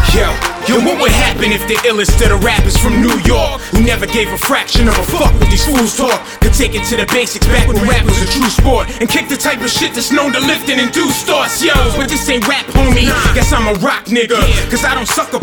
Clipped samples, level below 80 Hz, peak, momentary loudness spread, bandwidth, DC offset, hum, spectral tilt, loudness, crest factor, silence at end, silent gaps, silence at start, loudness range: under 0.1%; -16 dBFS; 0 dBFS; 3 LU; over 20 kHz; 0.3%; none; -4 dB/octave; -12 LUFS; 10 dB; 0 s; none; 0 s; 1 LU